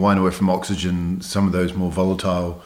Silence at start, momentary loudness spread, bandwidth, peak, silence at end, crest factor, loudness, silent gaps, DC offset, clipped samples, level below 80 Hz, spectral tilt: 0 s; 5 LU; 15 kHz; -6 dBFS; 0.05 s; 14 dB; -21 LUFS; none; under 0.1%; under 0.1%; -42 dBFS; -6.5 dB/octave